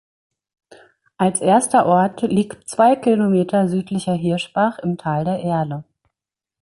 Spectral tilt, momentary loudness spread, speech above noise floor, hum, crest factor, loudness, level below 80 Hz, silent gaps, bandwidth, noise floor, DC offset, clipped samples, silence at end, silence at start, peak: -6 dB/octave; 8 LU; 67 dB; none; 16 dB; -18 LUFS; -58 dBFS; none; 11.5 kHz; -85 dBFS; under 0.1%; under 0.1%; 0.8 s; 1.2 s; -2 dBFS